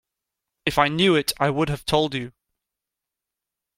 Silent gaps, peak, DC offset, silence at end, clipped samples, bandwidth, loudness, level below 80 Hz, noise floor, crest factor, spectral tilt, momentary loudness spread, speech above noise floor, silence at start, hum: none; -4 dBFS; under 0.1%; 1.5 s; under 0.1%; 16.5 kHz; -22 LUFS; -50 dBFS; -86 dBFS; 22 dB; -4.5 dB/octave; 10 LU; 65 dB; 0.65 s; none